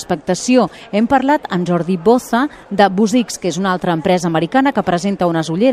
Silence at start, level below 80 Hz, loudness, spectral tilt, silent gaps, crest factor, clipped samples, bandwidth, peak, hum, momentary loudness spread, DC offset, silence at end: 0 s; -50 dBFS; -15 LUFS; -5.5 dB/octave; none; 14 dB; under 0.1%; 14.5 kHz; 0 dBFS; none; 5 LU; under 0.1%; 0 s